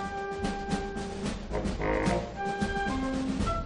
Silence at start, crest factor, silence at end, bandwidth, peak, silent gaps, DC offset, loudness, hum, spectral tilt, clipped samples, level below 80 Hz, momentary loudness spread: 0 s; 16 dB; 0 s; 10.5 kHz; -14 dBFS; none; under 0.1%; -32 LUFS; none; -5.5 dB/octave; under 0.1%; -40 dBFS; 6 LU